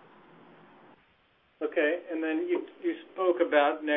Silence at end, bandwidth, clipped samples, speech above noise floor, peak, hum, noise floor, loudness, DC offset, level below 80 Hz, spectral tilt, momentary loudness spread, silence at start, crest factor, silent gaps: 0 s; 3.9 kHz; under 0.1%; 38 dB; -10 dBFS; none; -66 dBFS; -29 LUFS; under 0.1%; -80 dBFS; -7.5 dB/octave; 10 LU; 1.6 s; 20 dB; none